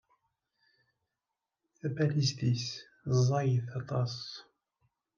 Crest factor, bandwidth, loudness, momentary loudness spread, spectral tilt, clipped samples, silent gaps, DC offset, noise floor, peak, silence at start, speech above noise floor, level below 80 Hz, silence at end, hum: 18 dB; 7.2 kHz; -32 LUFS; 13 LU; -6 dB/octave; under 0.1%; none; under 0.1%; -89 dBFS; -16 dBFS; 1.85 s; 58 dB; -72 dBFS; 0.75 s; none